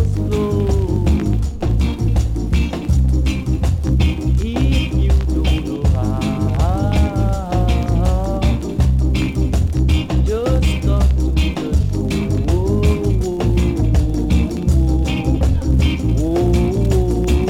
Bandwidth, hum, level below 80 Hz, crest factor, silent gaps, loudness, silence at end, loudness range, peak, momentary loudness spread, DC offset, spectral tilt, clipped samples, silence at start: 12 kHz; none; -18 dBFS; 12 dB; none; -17 LUFS; 0 s; 1 LU; -4 dBFS; 3 LU; under 0.1%; -7.5 dB/octave; under 0.1%; 0 s